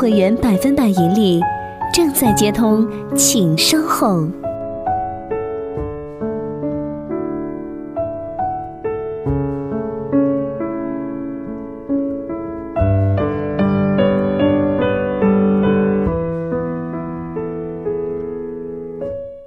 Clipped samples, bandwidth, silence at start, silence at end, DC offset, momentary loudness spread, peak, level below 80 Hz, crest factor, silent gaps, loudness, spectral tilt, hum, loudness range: under 0.1%; 15.5 kHz; 0 s; 0 s; under 0.1%; 12 LU; -2 dBFS; -38 dBFS; 16 dB; none; -18 LUFS; -5 dB/octave; none; 9 LU